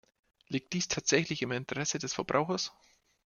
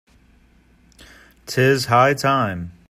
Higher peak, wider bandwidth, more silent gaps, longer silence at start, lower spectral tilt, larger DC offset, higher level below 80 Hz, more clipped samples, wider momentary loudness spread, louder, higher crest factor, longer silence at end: second, -10 dBFS vs -2 dBFS; second, 11 kHz vs 15.5 kHz; neither; second, 0.5 s vs 1.45 s; second, -3.5 dB/octave vs -5 dB/octave; neither; second, -66 dBFS vs -54 dBFS; neither; about the same, 9 LU vs 9 LU; second, -32 LUFS vs -18 LUFS; about the same, 24 dB vs 20 dB; first, 0.7 s vs 0.2 s